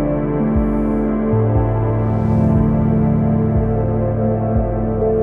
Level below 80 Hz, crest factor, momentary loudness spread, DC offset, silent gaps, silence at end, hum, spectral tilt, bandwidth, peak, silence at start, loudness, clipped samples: -26 dBFS; 12 dB; 3 LU; under 0.1%; none; 0 s; none; -12 dB/octave; 3.1 kHz; -4 dBFS; 0 s; -17 LUFS; under 0.1%